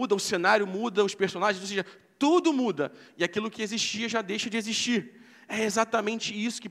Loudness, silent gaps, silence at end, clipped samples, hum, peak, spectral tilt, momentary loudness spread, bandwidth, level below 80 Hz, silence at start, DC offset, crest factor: -27 LUFS; none; 0 s; under 0.1%; none; -8 dBFS; -3.5 dB/octave; 9 LU; 15 kHz; -76 dBFS; 0 s; under 0.1%; 20 dB